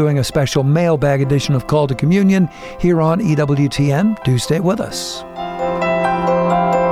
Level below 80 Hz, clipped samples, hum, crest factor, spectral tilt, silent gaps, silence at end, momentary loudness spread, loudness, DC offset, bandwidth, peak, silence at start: -40 dBFS; under 0.1%; none; 12 dB; -6.5 dB/octave; none; 0 s; 7 LU; -16 LUFS; under 0.1%; 15 kHz; -4 dBFS; 0 s